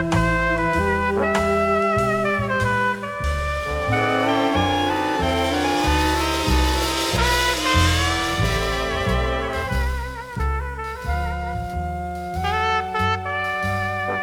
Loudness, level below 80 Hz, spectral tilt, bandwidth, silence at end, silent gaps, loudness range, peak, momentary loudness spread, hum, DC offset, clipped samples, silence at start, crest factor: -21 LUFS; -30 dBFS; -4.5 dB/octave; 18.5 kHz; 0 s; none; 6 LU; -6 dBFS; 8 LU; none; under 0.1%; under 0.1%; 0 s; 16 dB